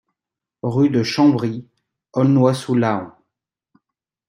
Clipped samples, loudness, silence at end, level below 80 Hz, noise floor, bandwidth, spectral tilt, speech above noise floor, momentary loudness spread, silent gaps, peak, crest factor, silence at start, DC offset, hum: under 0.1%; -18 LUFS; 1.2 s; -62 dBFS; -87 dBFS; 12 kHz; -7 dB/octave; 70 dB; 13 LU; none; -2 dBFS; 18 dB; 0.65 s; under 0.1%; none